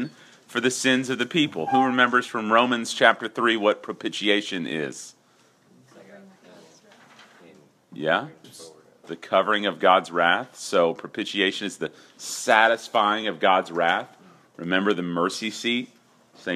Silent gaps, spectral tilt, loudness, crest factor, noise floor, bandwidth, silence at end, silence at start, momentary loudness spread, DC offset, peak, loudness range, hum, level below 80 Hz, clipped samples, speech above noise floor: none; -3.5 dB/octave; -23 LUFS; 24 dB; -60 dBFS; 14.5 kHz; 0 s; 0 s; 15 LU; under 0.1%; 0 dBFS; 12 LU; none; -78 dBFS; under 0.1%; 37 dB